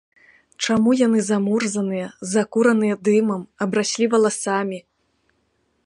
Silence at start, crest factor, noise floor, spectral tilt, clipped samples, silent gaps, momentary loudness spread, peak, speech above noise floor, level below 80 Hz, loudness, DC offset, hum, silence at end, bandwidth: 0.6 s; 16 dB; -67 dBFS; -4.5 dB/octave; under 0.1%; none; 8 LU; -4 dBFS; 48 dB; -64 dBFS; -20 LUFS; under 0.1%; none; 1.05 s; 11.5 kHz